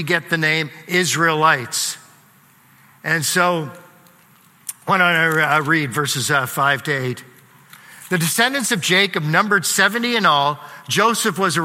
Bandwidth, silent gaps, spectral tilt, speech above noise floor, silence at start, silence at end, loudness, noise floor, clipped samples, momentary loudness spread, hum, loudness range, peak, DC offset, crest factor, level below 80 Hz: 16.5 kHz; none; -3 dB/octave; 34 dB; 0 s; 0 s; -17 LUFS; -52 dBFS; under 0.1%; 10 LU; none; 4 LU; 0 dBFS; under 0.1%; 20 dB; -66 dBFS